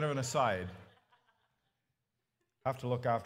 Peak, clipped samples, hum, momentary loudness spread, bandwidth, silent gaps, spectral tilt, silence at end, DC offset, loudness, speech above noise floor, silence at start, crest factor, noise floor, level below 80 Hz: -18 dBFS; under 0.1%; none; 8 LU; 16 kHz; none; -5 dB/octave; 0 s; under 0.1%; -35 LUFS; 52 dB; 0 s; 20 dB; -86 dBFS; -70 dBFS